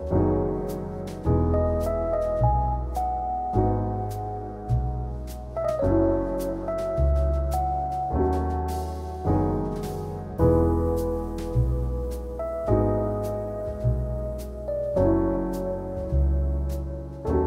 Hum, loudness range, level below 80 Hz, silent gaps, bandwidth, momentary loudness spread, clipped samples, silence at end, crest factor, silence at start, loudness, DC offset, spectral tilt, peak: none; 2 LU; -30 dBFS; none; 15.5 kHz; 10 LU; under 0.1%; 0 s; 18 dB; 0 s; -26 LUFS; under 0.1%; -9 dB/octave; -8 dBFS